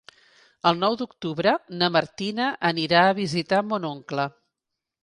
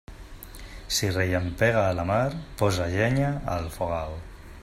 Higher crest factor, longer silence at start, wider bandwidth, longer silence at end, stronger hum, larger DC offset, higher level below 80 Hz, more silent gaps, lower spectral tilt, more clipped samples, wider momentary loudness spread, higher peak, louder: about the same, 20 dB vs 18 dB; first, 0.65 s vs 0.1 s; second, 11 kHz vs 16 kHz; first, 0.75 s vs 0 s; neither; neither; second, -66 dBFS vs -44 dBFS; neither; about the same, -5.5 dB/octave vs -5 dB/octave; neither; second, 11 LU vs 20 LU; first, -4 dBFS vs -8 dBFS; about the same, -24 LUFS vs -26 LUFS